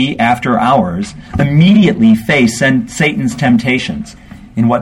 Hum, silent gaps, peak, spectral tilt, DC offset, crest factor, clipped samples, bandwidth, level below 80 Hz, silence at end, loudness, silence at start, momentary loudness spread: none; none; 0 dBFS; -6 dB/octave; under 0.1%; 12 dB; under 0.1%; 13 kHz; -38 dBFS; 0 s; -11 LUFS; 0 s; 13 LU